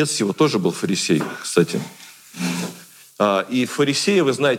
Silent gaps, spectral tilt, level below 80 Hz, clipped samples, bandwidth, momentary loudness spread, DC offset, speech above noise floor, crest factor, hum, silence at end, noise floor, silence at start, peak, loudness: none; -4.5 dB/octave; -70 dBFS; under 0.1%; 17 kHz; 14 LU; under 0.1%; 23 dB; 18 dB; none; 0 s; -42 dBFS; 0 s; -2 dBFS; -20 LUFS